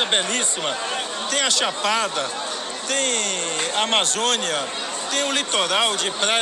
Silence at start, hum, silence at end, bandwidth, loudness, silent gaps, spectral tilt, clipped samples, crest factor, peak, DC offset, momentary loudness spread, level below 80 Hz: 0 s; none; 0 s; 15 kHz; -20 LUFS; none; 0.5 dB/octave; under 0.1%; 18 dB; -4 dBFS; under 0.1%; 8 LU; -68 dBFS